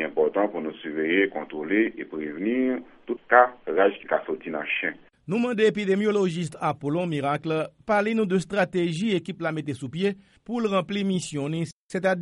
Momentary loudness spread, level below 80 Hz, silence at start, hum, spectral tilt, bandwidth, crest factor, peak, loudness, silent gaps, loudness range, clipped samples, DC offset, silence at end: 9 LU; -64 dBFS; 0 s; none; -6 dB/octave; 11.5 kHz; 24 dB; -2 dBFS; -25 LUFS; 11.72-11.89 s; 3 LU; under 0.1%; under 0.1%; 0 s